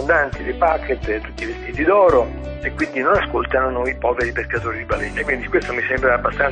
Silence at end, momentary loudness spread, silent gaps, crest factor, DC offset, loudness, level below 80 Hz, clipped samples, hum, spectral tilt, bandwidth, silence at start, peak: 0 s; 10 LU; none; 16 dB; under 0.1%; -19 LUFS; -34 dBFS; under 0.1%; none; -6.5 dB/octave; 9.8 kHz; 0 s; -2 dBFS